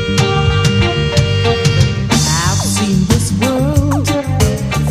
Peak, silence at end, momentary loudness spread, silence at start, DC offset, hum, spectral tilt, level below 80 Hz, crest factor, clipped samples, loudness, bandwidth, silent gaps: 0 dBFS; 0 s; 2 LU; 0 s; under 0.1%; none; -5 dB/octave; -26 dBFS; 12 dB; under 0.1%; -13 LUFS; 15.5 kHz; none